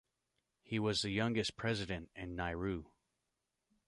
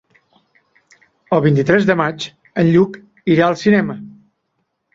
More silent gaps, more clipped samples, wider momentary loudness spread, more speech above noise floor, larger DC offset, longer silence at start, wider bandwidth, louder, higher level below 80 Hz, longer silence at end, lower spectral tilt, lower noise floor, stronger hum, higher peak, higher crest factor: neither; neither; second, 9 LU vs 12 LU; second, 49 dB vs 56 dB; neither; second, 0.7 s vs 1.3 s; first, 11.5 kHz vs 7.6 kHz; second, -38 LUFS vs -16 LUFS; about the same, -58 dBFS vs -54 dBFS; first, 1.05 s vs 0.85 s; second, -5 dB/octave vs -7.5 dB/octave; first, -87 dBFS vs -70 dBFS; neither; second, -22 dBFS vs -2 dBFS; about the same, 18 dB vs 16 dB